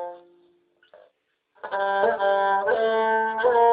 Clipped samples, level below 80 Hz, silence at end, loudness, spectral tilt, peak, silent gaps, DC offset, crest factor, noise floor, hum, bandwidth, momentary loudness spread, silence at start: under 0.1%; -70 dBFS; 0 s; -22 LUFS; -7.5 dB/octave; -8 dBFS; none; under 0.1%; 16 dB; -69 dBFS; none; 4.9 kHz; 10 LU; 0 s